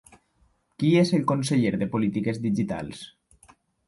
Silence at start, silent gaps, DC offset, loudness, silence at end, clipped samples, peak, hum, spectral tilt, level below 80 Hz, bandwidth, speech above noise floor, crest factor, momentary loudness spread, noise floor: 0.8 s; none; under 0.1%; -24 LUFS; 0.8 s; under 0.1%; -10 dBFS; none; -6.5 dB/octave; -58 dBFS; 11.5 kHz; 42 dB; 16 dB; 15 LU; -66 dBFS